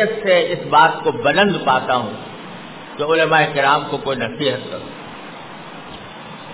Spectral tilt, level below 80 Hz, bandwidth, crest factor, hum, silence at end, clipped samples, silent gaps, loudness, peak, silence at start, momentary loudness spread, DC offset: -8.5 dB/octave; -56 dBFS; 4 kHz; 18 dB; none; 0 s; under 0.1%; none; -16 LUFS; 0 dBFS; 0 s; 20 LU; 0.3%